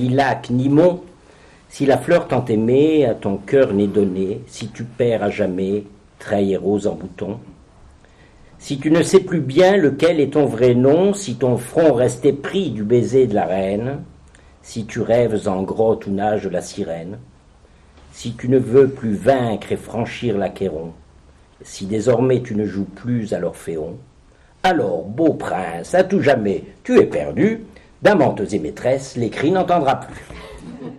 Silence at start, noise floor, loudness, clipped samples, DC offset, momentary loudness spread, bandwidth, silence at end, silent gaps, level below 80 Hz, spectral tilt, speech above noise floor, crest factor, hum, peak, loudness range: 0 s; -50 dBFS; -18 LUFS; under 0.1%; under 0.1%; 15 LU; 12.5 kHz; 0 s; none; -48 dBFS; -6.5 dB/octave; 32 dB; 18 dB; none; 0 dBFS; 6 LU